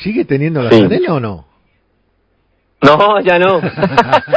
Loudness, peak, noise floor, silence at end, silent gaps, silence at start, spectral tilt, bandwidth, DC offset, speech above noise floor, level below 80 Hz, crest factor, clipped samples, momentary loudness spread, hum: -11 LUFS; 0 dBFS; -59 dBFS; 0 s; none; 0 s; -7.5 dB/octave; 8 kHz; under 0.1%; 48 dB; -44 dBFS; 12 dB; 0.9%; 8 LU; none